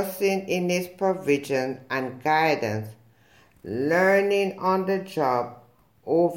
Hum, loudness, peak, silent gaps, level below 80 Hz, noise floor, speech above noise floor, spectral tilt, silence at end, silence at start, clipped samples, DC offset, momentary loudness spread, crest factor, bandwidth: none; -24 LUFS; -8 dBFS; none; -70 dBFS; -58 dBFS; 34 dB; -5.5 dB/octave; 0 s; 0 s; under 0.1%; under 0.1%; 12 LU; 16 dB; 16.5 kHz